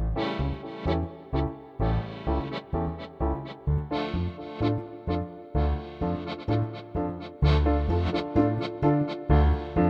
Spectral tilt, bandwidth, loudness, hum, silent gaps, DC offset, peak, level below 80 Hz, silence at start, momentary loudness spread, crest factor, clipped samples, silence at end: -9 dB/octave; 6 kHz; -28 LUFS; none; none; under 0.1%; -8 dBFS; -32 dBFS; 0 s; 8 LU; 20 dB; under 0.1%; 0 s